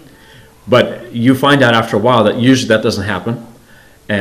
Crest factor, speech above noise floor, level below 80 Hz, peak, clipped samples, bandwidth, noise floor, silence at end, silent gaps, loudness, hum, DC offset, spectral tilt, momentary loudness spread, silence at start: 14 dB; 31 dB; -50 dBFS; 0 dBFS; 0.4%; 15.5 kHz; -43 dBFS; 0 s; none; -12 LUFS; none; 0.2%; -5.5 dB/octave; 10 LU; 0.65 s